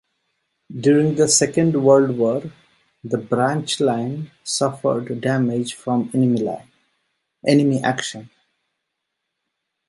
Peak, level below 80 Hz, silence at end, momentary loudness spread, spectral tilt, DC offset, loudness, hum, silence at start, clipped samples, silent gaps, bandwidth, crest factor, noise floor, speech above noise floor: -2 dBFS; -62 dBFS; 1.65 s; 13 LU; -5 dB/octave; under 0.1%; -19 LUFS; none; 0.7 s; under 0.1%; none; 11.5 kHz; 18 dB; -78 dBFS; 60 dB